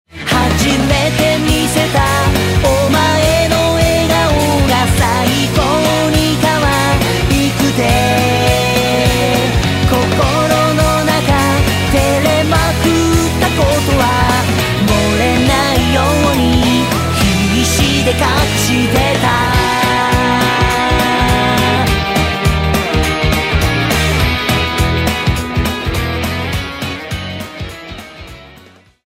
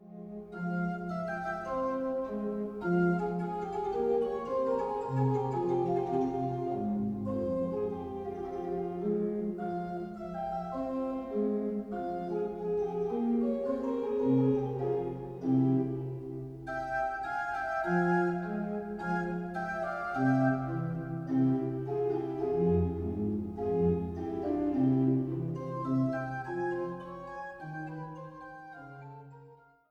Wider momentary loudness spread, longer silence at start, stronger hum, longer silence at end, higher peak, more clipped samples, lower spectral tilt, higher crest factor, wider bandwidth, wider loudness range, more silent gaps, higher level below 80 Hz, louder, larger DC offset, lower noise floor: second, 5 LU vs 12 LU; first, 0.15 s vs 0 s; neither; first, 0.6 s vs 0.35 s; first, 0 dBFS vs -16 dBFS; neither; second, -4.5 dB/octave vs -9.5 dB/octave; about the same, 12 dB vs 16 dB; first, 16.5 kHz vs 7.6 kHz; about the same, 3 LU vs 4 LU; neither; first, -24 dBFS vs -58 dBFS; first, -12 LUFS vs -33 LUFS; neither; second, -42 dBFS vs -57 dBFS